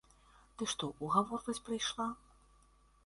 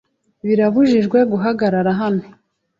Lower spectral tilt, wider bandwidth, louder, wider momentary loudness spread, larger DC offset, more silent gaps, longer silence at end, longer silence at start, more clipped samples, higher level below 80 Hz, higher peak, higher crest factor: second, -3.5 dB/octave vs -8.5 dB/octave; first, 11.5 kHz vs 7.4 kHz; second, -37 LUFS vs -16 LUFS; about the same, 10 LU vs 8 LU; neither; neither; first, 0.9 s vs 0.55 s; first, 0.6 s vs 0.45 s; neither; second, -66 dBFS vs -58 dBFS; second, -16 dBFS vs -4 dBFS; first, 24 dB vs 12 dB